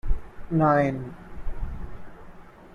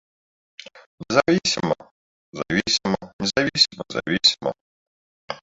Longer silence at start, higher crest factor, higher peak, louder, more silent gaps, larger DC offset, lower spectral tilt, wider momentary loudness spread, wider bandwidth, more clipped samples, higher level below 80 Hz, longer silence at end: second, 0.05 s vs 0.75 s; about the same, 18 dB vs 22 dB; second, -8 dBFS vs -2 dBFS; second, -25 LUFS vs -21 LUFS; second, none vs 0.86-0.98 s, 1.91-2.32 s, 3.13-3.19 s, 4.61-5.28 s; neither; first, -9.5 dB/octave vs -3.5 dB/octave; first, 21 LU vs 17 LU; second, 6.6 kHz vs 8 kHz; neither; first, -34 dBFS vs -56 dBFS; about the same, 0.05 s vs 0.05 s